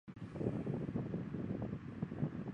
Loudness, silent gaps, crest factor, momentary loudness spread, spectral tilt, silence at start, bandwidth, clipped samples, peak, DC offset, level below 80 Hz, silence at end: -42 LUFS; none; 20 dB; 4 LU; -10 dB/octave; 0.05 s; 8 kHz; under 0.1%; -22 dBFS; under 0.1%; -60 dBFS; 0 s